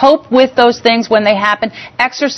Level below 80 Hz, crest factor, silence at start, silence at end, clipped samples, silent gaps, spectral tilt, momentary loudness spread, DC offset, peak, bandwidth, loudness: -52 dBFS; 12 dB; 0 s; 0 s; 0.4%; none; -4 dB/octave; 6 LU; under 0.1%; 0 dBFS; 8.4 kHz; -11 LUFS